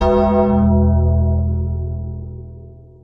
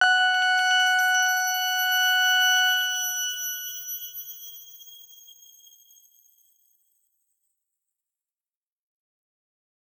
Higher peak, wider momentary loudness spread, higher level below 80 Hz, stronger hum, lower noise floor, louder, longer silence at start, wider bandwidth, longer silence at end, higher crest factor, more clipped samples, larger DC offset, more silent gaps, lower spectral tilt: first, -4 dBFS vs -8 dBFS; about the same, 18 LU vs 20 LU; first, -24 dBFS vs under -90 dBFS; neither; second, -38 dBFS vs under -90 dBFS; first, -16 LUFS vs -21 LUFS; about the same, 0 s vs 0 s; second, 5.2 kHz vs over 20 kHz; second, 0.3 s vs 4.95 s; second, 12 dB vs 18 dB; neither; neither; neither; first, -11 dB/octave vs 6.5 dB/octave